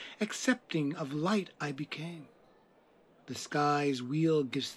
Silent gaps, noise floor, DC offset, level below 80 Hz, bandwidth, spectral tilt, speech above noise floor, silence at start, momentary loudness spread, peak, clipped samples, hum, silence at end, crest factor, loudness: none; -64 dBFS; under 0.1%; -84 dBFS; 13 kHz; -5 dB/octave; 32 dB; 0 s; 12 LU; -14 dBFS; under 0.1%; none; 0 s; 20 dB; -33 LUFS